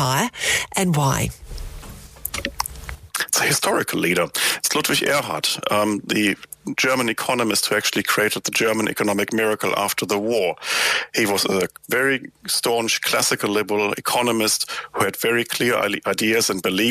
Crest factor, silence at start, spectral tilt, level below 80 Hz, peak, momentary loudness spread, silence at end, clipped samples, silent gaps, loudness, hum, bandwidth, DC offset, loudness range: 20 dB; 0 s; -3 dB/octave; -46 dBFS; -2 dBFS; 8 LU; 0 s; under 0.1%; none; -20 LUFS; none; 15.5 kHz; under 0.1%; 3 LU